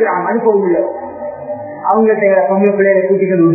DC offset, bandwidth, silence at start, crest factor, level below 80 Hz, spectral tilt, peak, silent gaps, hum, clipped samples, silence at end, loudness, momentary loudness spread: under 0.1%; 2.7 kHz; 0 s; 12 dB; -58 dBFS; -13.5 dB/octave; 0 dBFS; none; none; under 0.1%; 0 s; -12 LUFS; 14 LU